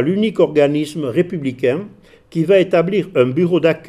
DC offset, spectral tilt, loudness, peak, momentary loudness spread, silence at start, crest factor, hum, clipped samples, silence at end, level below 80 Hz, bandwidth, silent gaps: under 0.1%; -7.5 dB/octave; -16 LUFS; 0 dBFS; 8 LU; 0 s; 16 dB; none; under 0.1%; 0.1 s; -56 dBFS; 13 kHz; none